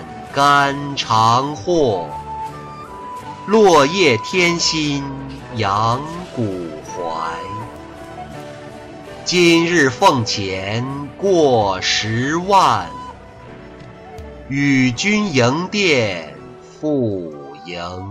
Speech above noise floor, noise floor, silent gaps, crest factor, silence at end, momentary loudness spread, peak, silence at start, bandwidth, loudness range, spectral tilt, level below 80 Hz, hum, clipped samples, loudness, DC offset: 21 dB; -37 dBFS; none; 16 dB; 0 s; 21 LU; -2 dBFS; 0 s; 15 kHz; 7 LU; -4.5 dB/octave; -46 dBFS; none; under 0.1%; -16 LUFS; under 0.1%